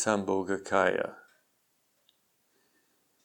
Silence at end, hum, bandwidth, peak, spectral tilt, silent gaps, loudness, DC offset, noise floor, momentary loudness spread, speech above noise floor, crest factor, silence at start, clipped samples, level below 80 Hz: 2.05 s; none; 19 kHz; -10 dBFS; -4 dB/octave; none; -29 LUFS; under 0.1%; -73 dBFS; 8 LU; 45 dB; 22 dB; 0 s; under 0.1%; -72 dBFS